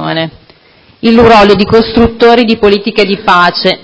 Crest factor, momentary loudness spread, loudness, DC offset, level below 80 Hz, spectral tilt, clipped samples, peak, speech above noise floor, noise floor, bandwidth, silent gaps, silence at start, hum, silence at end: 8 dB; 10 LU; -7 LUFS; under 0.1%; -30 dBFS; -6 dB/octave; 4%; 0 dBFS; 36 dB; -43 dBFS; 8 kHz; none; 0 s; none; 0.05 s